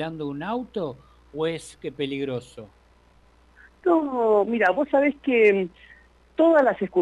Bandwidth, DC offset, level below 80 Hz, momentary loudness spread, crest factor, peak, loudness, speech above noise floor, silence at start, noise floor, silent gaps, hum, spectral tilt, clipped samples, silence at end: 11.5 kHz; under 0.1%; -58 dBFS; 15 LU; 16 dB; -8 dBFS; -23 LUFS; 34 dB; 0 s; -57 dBFS; none; none; -6.5 dB/octave; under 0.1%; 0 s